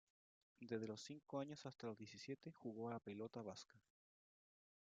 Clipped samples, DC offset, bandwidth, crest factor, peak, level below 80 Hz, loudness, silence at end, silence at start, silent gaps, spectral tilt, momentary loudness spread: under 0.1%; under 0.1%; 9 kHz; 20 dB; -34 dBFS; under -90 dBFS; -53 LUFS; 1.05 s; 0.6 s; none; -5.5 dB/octave; 6 LU